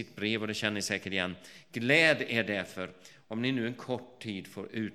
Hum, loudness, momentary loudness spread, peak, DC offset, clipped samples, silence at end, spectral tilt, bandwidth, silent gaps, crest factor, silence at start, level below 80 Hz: none; -31 LUFS; 17 LU; -10 dBFS; under 0.1%; under 0.1%; 0 s; -4 dB/octave; 15.5 kHz; none; 24 dB; 0 s; -72 dBFS